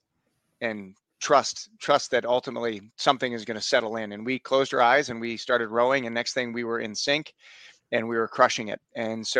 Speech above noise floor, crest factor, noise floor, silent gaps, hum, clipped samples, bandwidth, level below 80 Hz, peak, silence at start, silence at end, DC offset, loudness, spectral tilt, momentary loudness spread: 49 dB; 22 dB; -75 dBFS; none; none; under 0.1%; 10 kHz; -70 dBFS; -4 dBFS; 0.6 s; 0 s; under 0.1%; -26 LUFS; -3 dB/octave; 10 LU